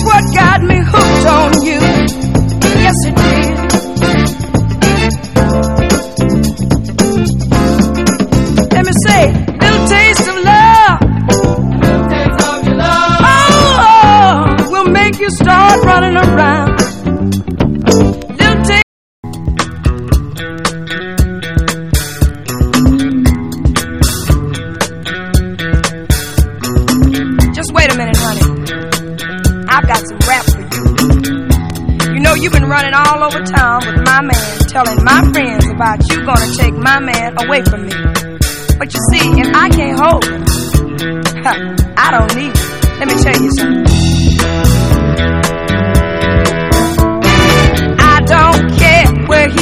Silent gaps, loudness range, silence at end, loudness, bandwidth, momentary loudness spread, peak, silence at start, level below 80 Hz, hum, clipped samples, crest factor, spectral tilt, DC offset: 18.83-19.23 s; 6 LU; 0 s; -10 LUFS; 16 kHz; 9 LU; 0 dBFS; 0 s; -18 dBFS; none; 1%; 10 dB; -5 dB/octave; 2%